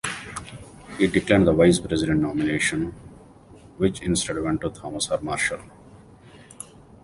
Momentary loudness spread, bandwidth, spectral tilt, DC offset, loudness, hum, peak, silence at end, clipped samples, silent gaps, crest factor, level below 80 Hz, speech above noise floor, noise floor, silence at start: 22 LU; 11.5 kHz; -5 dB/octave; under 0.1%; -23 LUFS; none; -4 dBFS; 0.4 s; under 0.1%; none; 22 dB; -44 dBFS; 26 dB; -48 dBFS; 0.05 s